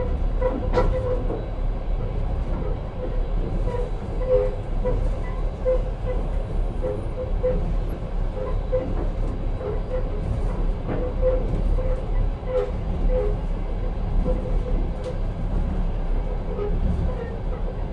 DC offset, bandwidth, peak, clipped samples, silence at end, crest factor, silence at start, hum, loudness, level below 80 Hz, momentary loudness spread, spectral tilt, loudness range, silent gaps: under 0.1%; 5 kHz; -8 dBFS; under 0.1%; 0 s; 16 dB; 0 s; none; -27 LUFS; -24 dBFS; 6 LU; -9 dB/octave; 2 LU; none